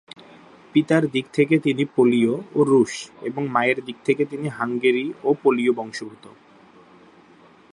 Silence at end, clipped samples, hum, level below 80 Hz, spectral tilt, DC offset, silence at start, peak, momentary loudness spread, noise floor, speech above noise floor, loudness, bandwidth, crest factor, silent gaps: 1.6 s; under 0.1%; none; -70 dBFS; -6 dB/octave; under 0.1%; 0.75 s; -4 dBFS; 10 LU; -51 dBFS; 30 dB; -21 LUFS; 11 kHz; 18 dB; none